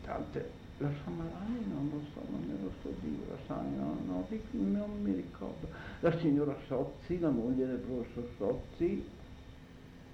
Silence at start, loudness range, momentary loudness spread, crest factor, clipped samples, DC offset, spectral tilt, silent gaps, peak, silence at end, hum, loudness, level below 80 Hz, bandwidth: 0 s; 5 LU; 12 LU; 20 dB; under 0.1%; under 0.1%; -9 dB/octave; none; -18 dBFS; 0 s; none; -37 LUFS; -54 dBFS; 8.2 kHz